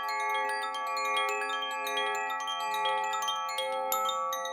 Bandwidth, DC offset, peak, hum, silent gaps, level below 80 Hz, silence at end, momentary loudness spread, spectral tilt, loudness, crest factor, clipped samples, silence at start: 20 kHz; under 0.1%; -14 dBFS; none; none; under -90 dBFS; 0 s; 3 LU; 1 dB/octave; -31 LUFS; 18 dB; under 0.1%; 0 s